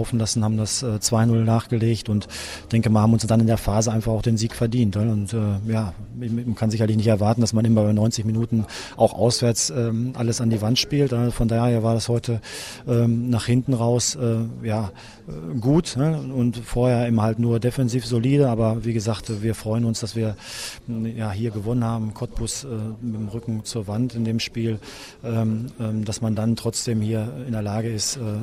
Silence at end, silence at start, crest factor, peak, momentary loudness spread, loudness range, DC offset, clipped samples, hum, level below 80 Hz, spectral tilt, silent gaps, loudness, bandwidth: 0 s; 0 s; 18 dB; -4 dBFS; 10 LU; 6 LU; under 0.1%; under 0.1%; none; -44 dBFS; -6 dB/octave; none; -22 LUFS; 15 kHz